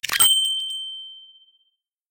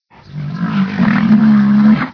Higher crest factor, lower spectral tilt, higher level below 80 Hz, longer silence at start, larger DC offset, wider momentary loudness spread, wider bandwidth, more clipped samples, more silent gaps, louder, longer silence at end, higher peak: first, 22 dB vs 12 dB; second, 3 dB/octave vs -9 dB/octave; second, -64 dBFS vs -44 dBFS; second, 0.05 s vs 0.3 s; neither; first, 21 LU vs 16 LU; first, 17 kHz vs 5.4 kHz; neither; neither; second, -18 LUFS vs -12 LUFS; first, 0.85 s vs 0 s; about the same, -2 dBFS vs 0 dBFS